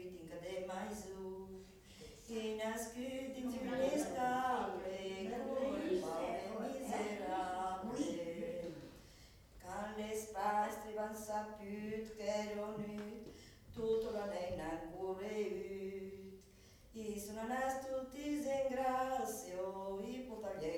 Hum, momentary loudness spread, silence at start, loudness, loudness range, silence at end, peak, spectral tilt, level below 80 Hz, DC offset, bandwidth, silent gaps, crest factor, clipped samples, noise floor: none; 15 LU; 0 s; -42 LUFS; 4 LU; 0 s; -26 dBFS; -4.5 dB/octave; -66 dBFS; under 0.1%; 19 kHz; none; 16 dB; under 0.1%; -63 dBFS